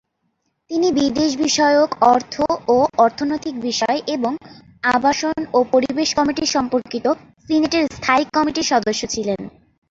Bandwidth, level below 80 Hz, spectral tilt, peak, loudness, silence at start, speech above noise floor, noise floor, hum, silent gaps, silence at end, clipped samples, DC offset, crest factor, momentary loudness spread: 8 kHz; -52 dBFS; -3 dB/octave; -2 dBFS; -18 LUFS; 0.7 s; 52 dB; -70 dBFS; none; none; 0.4 s; under 0.1%; under 0.1%; 18 dB; 8 LU